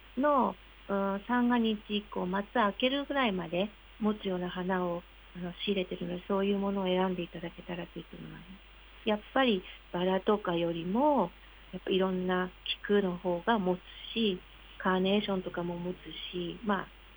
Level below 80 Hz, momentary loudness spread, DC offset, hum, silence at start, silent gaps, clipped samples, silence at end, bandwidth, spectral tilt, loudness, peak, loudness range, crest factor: -56 dBFS; 13 LU; under 0.1%; none; 0 s; none; under 0.1%; 0 s; over 20 kHz; -8.5 dB/octave; -32 LUFS; -14 dBFS; 3 LU; 18 dB